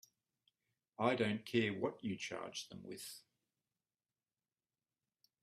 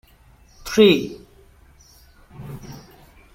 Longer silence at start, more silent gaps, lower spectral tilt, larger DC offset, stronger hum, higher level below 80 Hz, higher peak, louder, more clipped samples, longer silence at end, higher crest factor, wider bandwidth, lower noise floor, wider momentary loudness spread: first, 1 s vs 0.65 s; neither; about the same, -5 dB/octave vs -5 dB/octave; neither; neither; second, -80 dBFS vs -50 dBFS; second, -18 dBFS vs -2 dBFS; second, -40 LUFS vs -17 LUFS; neither; first, 2.2 s vs 0.6 s; about the same, 26 dB vs 22 dB; about the same, 15 kHz vs 16.5 kHz; first, under -90 dBFS vs -52 dBFS; second, 15 LU vs 27 LU